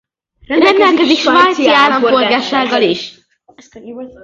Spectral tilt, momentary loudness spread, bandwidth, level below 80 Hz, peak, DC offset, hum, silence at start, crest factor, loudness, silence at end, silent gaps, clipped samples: -3.5 dB/octave; 19 LU; 7.8 kHz; -54 dBFS; 0 dBFS; under 0.1%; none; 0.5 s; 12 dB; -11 LUFS; 0.15 s; none; under 0.1%